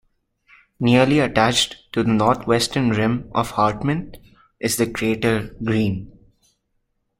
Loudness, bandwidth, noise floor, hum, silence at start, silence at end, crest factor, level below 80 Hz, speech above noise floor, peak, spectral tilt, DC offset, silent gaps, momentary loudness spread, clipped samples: -20 LUFS; 16.5 kHz; -71 dBFS; none; 0.8 s; 1.1 s; 20 dB; -46 dBFS; 51 dB; -2 dBFS; -5 dB/octave; under 0.1%; none; 8 LU; under 0.1%